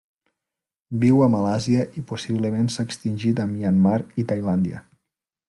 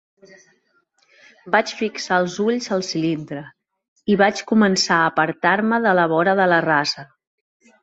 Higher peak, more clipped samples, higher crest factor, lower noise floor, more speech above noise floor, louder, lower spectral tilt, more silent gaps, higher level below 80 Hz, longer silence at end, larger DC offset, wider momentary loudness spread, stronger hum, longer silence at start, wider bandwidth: second, -6 dBFS vs -2 dBFS; neither; about the same, 16 dB vs 18 dB; first, -86 dBFS vs -64 dBFS; first, 65 dB vs 45 dB; second, -22 LUFS vs -19 LUFS; first, -7 dB/octave vs -4.5 dB/octave; second, none vs 3.88-3.96 s; about the same, -60 dBFS vs -64 dBFS; about the same, 0.7 s vs 0.8 s; neither; about the same, 10 LU vs 9 LU; neither; second, 0.9 s vs 1.45 s; first, 11.5 kHz vs 8 kHz